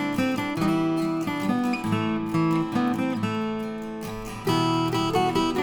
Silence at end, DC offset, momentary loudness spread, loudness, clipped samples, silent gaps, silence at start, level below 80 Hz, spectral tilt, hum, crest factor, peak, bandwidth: 0 s; under 0.1%; 8 LU; -25 LUFS; under 0.1%; none; 0 s; -52 dBFS; -6 dB/octave; none; 14 dB; -10 dBFS; over 20 kHz